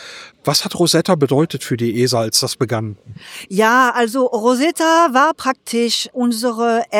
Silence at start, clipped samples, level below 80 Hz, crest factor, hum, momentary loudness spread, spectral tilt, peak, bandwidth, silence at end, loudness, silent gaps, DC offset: 0 s; under 0.1%; -60 dBFS; 14 dB; none; 11 LU; -4 dB/octave; -2 dBFS; 17.5 kHz; 0 s; -16 LUFS; none; under 0.1%